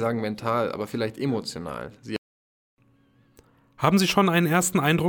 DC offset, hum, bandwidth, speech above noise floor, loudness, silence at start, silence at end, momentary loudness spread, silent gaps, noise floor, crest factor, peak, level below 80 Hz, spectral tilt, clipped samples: under 0.1%; none; 19.5 kHz; 37 dB; -24 LUFS; 0 s; 0 s; 15 LU; 2.18-2.77 s; -61 dBFS; 18 dB; -6 dBFS; -58 dBFS; -5 dB/octave; under 0.1%